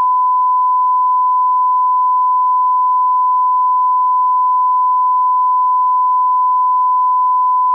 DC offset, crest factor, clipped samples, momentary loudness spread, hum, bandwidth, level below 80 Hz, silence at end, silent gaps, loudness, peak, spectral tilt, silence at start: under 0.1%; 4 dB; under 0.1%; 0 LU; none; 1.2 kHz; under -90 dBFS; 0 s; none; -13 LUFS; -10 dBFS; 0 dB/octave; 0 s